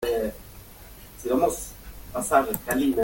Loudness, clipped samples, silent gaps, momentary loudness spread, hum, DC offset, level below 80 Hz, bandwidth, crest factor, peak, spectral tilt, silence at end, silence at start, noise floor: -26 LUFS; under 0.1%; none; 22 LU; none; under 0.1%; -46 dBFS; 17 kHz; 20 dB; -6 dBFS; -4.5 dB/octave; 0 s; 0 s; -45 dBFS